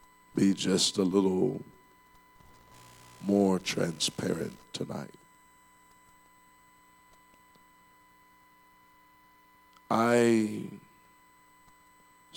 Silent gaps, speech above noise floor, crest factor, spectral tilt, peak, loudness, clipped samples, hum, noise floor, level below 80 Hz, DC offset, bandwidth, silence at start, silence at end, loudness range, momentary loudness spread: none; 33 dB; 20 dB; -4.5 dB/octave; -12 dBFS; -29 LUFS; under 0.1%; 60 Hz at -65 dBFS; -61 dBFS; -70 dBFS; under 0.1%; 18 kHz; 0.35 s; 1.6 s; 11 LU; 17 LU